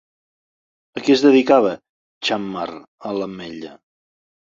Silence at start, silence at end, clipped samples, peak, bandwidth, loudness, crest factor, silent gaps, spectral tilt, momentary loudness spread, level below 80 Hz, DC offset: 0.95 s; 0.85 s; under 0.1%; -2 dBFS; 7.6 kHz; -18 LUFS; 20 dB; 1.89-2.21 s, 2.88-2.98 s; -5 dB/octave; 21 LU; -64 dBFS; under 0.1%